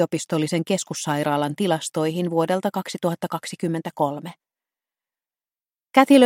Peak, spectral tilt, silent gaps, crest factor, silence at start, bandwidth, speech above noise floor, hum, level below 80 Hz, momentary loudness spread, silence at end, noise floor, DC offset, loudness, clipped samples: -2 dBFS; -5 dB/octave; none; 20 dB; 0 s; 16.5 kHz; over 69 dB; none; -70 dBFS; 6 LU; 0 s; under -90 dBFS; under 0.1%; -23 LUFS; under 0.1%